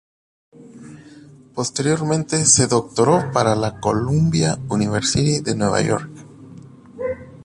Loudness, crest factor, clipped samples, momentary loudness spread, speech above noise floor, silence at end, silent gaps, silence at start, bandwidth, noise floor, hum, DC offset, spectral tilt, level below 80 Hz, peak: -19 LUFS; 20 dB; under 0.1%; 13 LU; 26 dB; 0 s; none; 0.6 s; 11.5 kHz; -44 dBFS; none; under 0.1%; -4.5 dB/octave; -46 dBFS; -2 dBFS